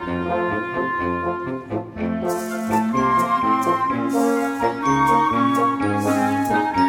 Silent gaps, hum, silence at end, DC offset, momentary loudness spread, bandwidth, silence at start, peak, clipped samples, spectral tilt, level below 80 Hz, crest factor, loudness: none; none; 0 s; under 0.1%; 8 LU; 18 kHz; 0 s; -6 dBFS; under 0.1%; -6 dB/octave; -50 dBFS; 14 dB; -21 LUFS